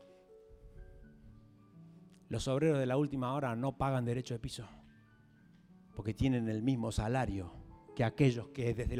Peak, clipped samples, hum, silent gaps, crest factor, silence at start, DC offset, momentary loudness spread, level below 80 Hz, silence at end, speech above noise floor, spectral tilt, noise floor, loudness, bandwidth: -16 dBFS; under 0.1%; none; none; 20 dB; 0 s; under 0.1%; 14 LU; -52 dBFS; 0 s; 29 dB; -7 dB/octave; -63 dBFS; -35 LUFS; 12.5 kHz